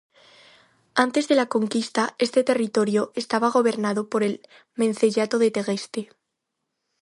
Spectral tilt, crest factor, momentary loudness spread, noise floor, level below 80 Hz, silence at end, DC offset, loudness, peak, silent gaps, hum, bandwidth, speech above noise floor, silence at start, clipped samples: -4.5 dB/octave; 22 dB; 8 LU; -80 dBFS; -74 dBFS; 1 s; under 0.1%; -23 LUFS; -2 dBFS; none; none; 11.5 kHz; 58 dB; 0.95 s; under 0.1%